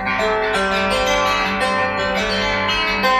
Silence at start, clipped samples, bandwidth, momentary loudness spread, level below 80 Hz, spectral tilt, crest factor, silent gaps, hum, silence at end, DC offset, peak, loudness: 0 s; under 0.1%; 15.5 kHz; 2 LU; -38 dBFS; -3.5 dB/octave; 14 dB; none; none; 0 s; under 0.1%; -4 dBFS; -17 LUFS